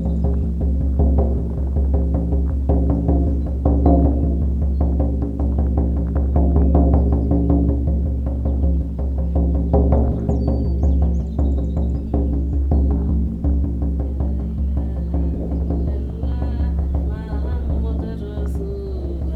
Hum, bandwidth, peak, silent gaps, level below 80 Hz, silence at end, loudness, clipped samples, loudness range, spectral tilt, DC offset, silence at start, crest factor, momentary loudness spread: none; 1.8 kHz; 0 dBFS; none; -20 dBFS; 0 s; -20 LUFS; under 0.1%; 5 LU; -11.5 dB/octave; under 0.1%; 0 s; 18 dB; 7 LU